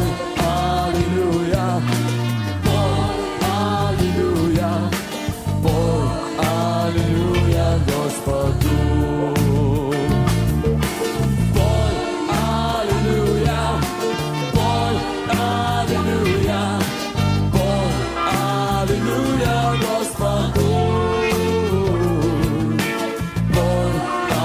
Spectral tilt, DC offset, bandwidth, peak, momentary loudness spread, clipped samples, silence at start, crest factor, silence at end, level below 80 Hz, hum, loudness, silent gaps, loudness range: -6 dB/octave; under 0.1%; 16 kHz; -4 dBFS; 4 LU; under 0.1%; 0 s; 14 dB; 0 s; -30 dBFS; none; -19 LUFS; none; 1 LU